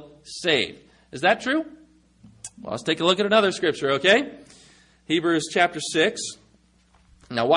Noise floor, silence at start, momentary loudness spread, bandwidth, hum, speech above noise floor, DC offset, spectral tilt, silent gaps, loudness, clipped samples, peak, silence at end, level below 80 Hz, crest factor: -59 dBFS; 0 s; 19 LU; 11 kHz; none; 37 dB; under 0.1%; -3.5 dB/octave; none; -22 LUFS; under 0.1%; -4 dBFS; 0 s; -64 dBFS; 20 dB